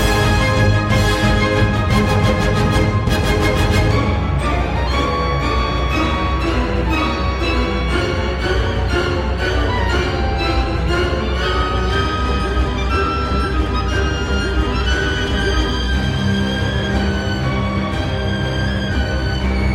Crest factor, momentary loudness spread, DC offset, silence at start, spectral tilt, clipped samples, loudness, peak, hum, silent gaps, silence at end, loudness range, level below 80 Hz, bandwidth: 14 dB; 4 LU; under 0.1%; 0 s; -6 dB/octave; under 0.1%; -18 LUFS; -2 dBFS; none; none; 0 s; 3 LU; -22 dBFS; 15 kHz